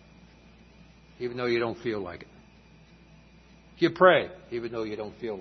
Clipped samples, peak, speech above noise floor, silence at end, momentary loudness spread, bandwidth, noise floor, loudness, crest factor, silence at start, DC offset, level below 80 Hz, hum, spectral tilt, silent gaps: under 0.1%; -6 dBFS; 28 dB; 0 s; 16 LU; 6.2 kHz; -55 dBFS; -27 LUFS; 24 dB; 1.2 s; under 0.1%; -60 dBFS; none; -6.5 dB/octave; none